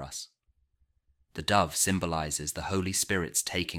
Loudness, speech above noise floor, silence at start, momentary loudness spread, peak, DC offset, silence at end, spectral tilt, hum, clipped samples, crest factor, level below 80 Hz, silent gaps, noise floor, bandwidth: -28 LUFS; 42 dB; 0 s; 14 LU; -8 dBFS; under 0.1%; 0 s; -3 dB/octave; none; under 0.1%; 22 dB; -52 dBFS; none; -71 dBFS; 17 kHz